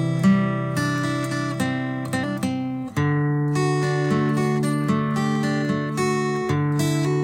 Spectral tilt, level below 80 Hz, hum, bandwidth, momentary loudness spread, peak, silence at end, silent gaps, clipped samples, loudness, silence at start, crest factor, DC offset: -6.5 dB/octave; -56 dBFS; none; 16 kHz; 5 LU; -8 dBFS; 0 s; none; under 0.1%; -23 LUFS; 0 s; 14 dB; under 0.1%